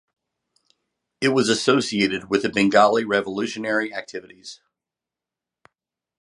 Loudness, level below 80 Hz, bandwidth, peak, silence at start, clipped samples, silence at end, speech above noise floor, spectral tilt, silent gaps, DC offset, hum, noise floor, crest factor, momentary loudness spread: -20 LUFS; -64 dBFS; 11.5 kHz; -2 dBFS; 1.2 s; under 0.1%; 1.65 s; 67 dB; -4 dB/octave; none; under 0.1%; none; -88 dBFS; 22 dB; 19 LU